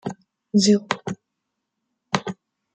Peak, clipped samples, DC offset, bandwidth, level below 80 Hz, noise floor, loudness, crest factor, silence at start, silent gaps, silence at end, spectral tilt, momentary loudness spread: -2 dBFS; under 0.1%; under 0.1%; 9.2 kHz; -66 dBFS; -80 dBFS; -22 LUFS; 24 dB; 0.05 s; none; 0.4 s; -4.5 dB/octave; 19 LU